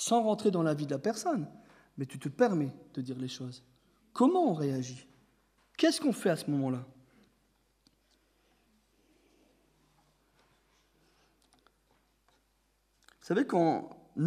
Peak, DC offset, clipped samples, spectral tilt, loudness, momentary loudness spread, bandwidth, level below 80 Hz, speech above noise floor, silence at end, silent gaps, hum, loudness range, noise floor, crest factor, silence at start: -14 dBFS; under 0.1%; under 0.1%; -5.5 dB/octave; -31 LUFS; 18 LU; 15.5 kHz; -76 dBFS; 43 dB; 0 s; none; none; 7 LU; -73 dBFS; 20 dB; 0 s